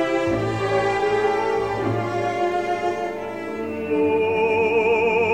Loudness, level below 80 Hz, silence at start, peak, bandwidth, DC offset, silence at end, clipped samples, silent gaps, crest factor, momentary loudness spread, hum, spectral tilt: -22 LUFS; -50 dBFS; 0 s; -8 dBFS; 9.8 kHz; 0.3%; 0 s; under 0.1%; none; 12 dB; 9 LU; none; -6 dB/octave